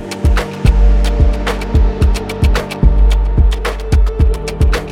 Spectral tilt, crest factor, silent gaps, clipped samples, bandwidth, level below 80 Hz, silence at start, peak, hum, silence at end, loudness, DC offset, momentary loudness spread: -6.5 dB/octave; 12 dB; none; under 0.1%; 12 kHz; -12 dBFS; 0 s; 0 dBFS; none; 0 s; -15 LUFS; under 0.1%; 3 LU